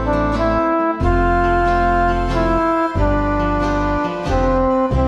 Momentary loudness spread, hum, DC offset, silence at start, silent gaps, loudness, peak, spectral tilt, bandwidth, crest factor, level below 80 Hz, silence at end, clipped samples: 3 LU; none; under 0.1%; 0 s; none; -17 LUFS; -4 dBFS; -7.5 dB/octave; 9.4 kHz; 12 dB; -24 dBFS; 0 s; under 0.1%